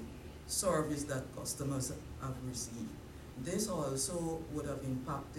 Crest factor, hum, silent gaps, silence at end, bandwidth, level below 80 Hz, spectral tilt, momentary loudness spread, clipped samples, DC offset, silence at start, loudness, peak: 18 dB; none; none; 0 s; 16 kHz; -56 dBFS; -4.5 dB/octave; 11 LU; under 0.1%; under 0.1%; 0 s; -38 LUFS; -20 dBFS